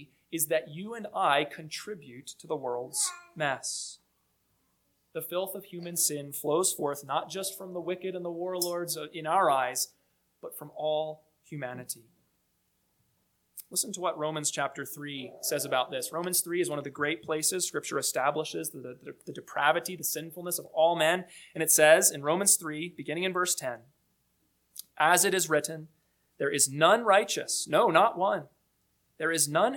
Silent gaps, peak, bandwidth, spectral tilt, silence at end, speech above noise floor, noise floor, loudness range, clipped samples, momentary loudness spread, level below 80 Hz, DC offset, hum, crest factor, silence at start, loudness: none; -6 dBFS; 19 kHz; -2 dB/octave; 0 s; 45 dB; -74 dBFS; 10 LU; under 0.1%; 17 LU; -80 dBFS; under 0.1%; none; 24 dB; 0 s; -28 LUFS